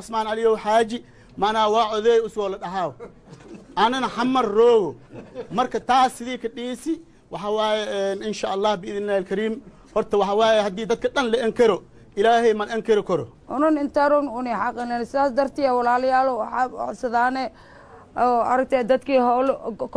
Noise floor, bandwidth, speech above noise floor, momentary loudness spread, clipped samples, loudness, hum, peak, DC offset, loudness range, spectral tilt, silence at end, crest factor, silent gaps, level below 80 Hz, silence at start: -43 dBFS; 11 kHz; 22 dB; 11 LU; under 0.1%; -22 LUFS; none; -6 dBFS; under 0.1%; 3 LU; -4.5 dB/octave; 0 s; 16 dB; none; -54 dBFS; 0 s